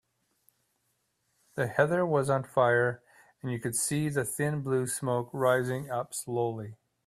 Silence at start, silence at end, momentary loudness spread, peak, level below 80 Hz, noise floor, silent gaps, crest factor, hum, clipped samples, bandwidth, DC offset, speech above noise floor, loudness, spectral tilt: 1.55 s; 0.35 s; 11 LU; -10 dBFS; -68 dBFS; -76 dBFS; none; 20 dB; none; under 0.1%; 16 kHz; under 0.1%; 48 dB; -29 LUFS; -5 dB/octave